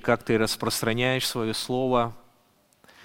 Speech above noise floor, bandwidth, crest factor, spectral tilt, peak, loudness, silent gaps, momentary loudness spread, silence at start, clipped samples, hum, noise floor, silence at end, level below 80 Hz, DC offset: 38 dB; 17 kHz; 22 dB; -4 dB/octave; -6 dBFS; -25 LUFS; none; 3 LU; 0.05 s; under 0.1%; none; -63 dBFS; 0.85 s; -50 dBFS; under 0.1%